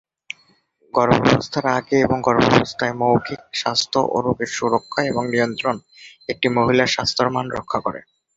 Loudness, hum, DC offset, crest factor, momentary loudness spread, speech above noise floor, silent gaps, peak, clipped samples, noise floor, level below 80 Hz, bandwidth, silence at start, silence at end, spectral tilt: -19 LUFS; none; under 0.1%; 20 dB; 13 LU; 40 dB; none; 0 dBFS; under 0.1%; -59 dBFS; -50 dBFS; 8 kHz; 0.95 s; 0.35 s; -5 dB/octave